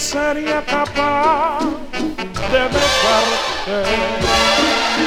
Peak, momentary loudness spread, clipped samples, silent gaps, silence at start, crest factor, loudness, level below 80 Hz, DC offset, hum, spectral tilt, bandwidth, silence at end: -2 dBFS; 9 LU; under 0.1%; none; 0 s; 16 dB; -16 LUFS; -36 dBFS; under 0.1%; none; -3 dB/octave; 19 kHz; 0 s